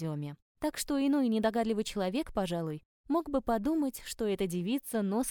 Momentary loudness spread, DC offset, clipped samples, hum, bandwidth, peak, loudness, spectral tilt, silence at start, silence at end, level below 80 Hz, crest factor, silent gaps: 9 LU; under 0.1%; under 0.1%; none; 20 kHz; -16 dBFS; -32 LUFS; -5.5 dB/octave; 0 s; 0 s; -54 dBFS; 16 dB; 0.42-0.55 s, 2.85-3.04 s